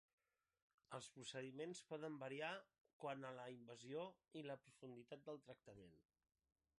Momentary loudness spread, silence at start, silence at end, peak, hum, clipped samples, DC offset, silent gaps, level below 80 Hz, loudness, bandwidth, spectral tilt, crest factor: 11 LU; 0.9 s; 0.8 s; -36 dBFS; none; under 0.1%; under 0.1%; 2.81-2.85 s, 2.93-3.00 s; under -90 dBFS; -55 LUFS; 11 kHz; -4.5 dB/octave; 20 dB